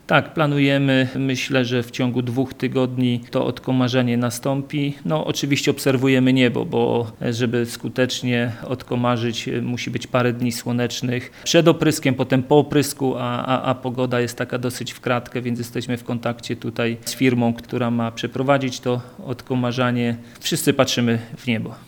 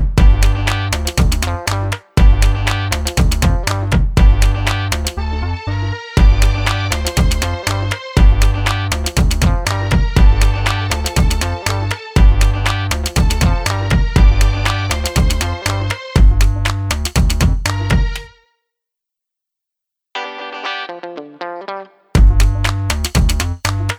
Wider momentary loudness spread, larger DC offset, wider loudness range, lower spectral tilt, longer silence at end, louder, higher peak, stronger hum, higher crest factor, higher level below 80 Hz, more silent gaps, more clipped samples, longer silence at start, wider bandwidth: about the same, 9 LU vs 9 LU; neither; about the same, 4 LU vs 6 LU; about the same, -5.5 dB/octave vs -4.5 dB/octave; about the same, 0.05 s vs 0 s; second, -21 LUFS vs -16 LUFS; about the same, 0 dBFS vs 0 dBFS; neither; first, 20 dB vs 14 dB; second, -56 dBFS vs -16 dBFS; neither; neither; about the same, 0.1 s vs 0 s; first, 19.5 kHz vs 16.5 kHz